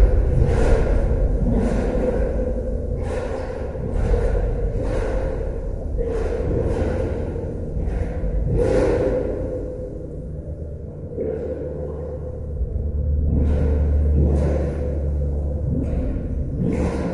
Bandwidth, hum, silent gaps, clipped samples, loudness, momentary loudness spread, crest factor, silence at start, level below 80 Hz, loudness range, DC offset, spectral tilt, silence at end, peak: 10.5 kHz; none; none; under 0.1%; -23 LUFS; 10 LU; 18 dB; 0 s; -24 dBFS; 5 LU; under 0.1%; -9 dB/octave; 0 s; -4 dBFS